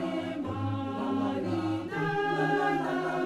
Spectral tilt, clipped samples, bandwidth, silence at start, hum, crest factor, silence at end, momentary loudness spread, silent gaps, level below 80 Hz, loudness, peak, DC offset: -7 dB/octave; under 0.1%; 13 kHz; 0 s; none; 14 dB; 0 s; 6 LU; none; -66 dBFS; -30 LUFS; -16 dBFS; under 0.1%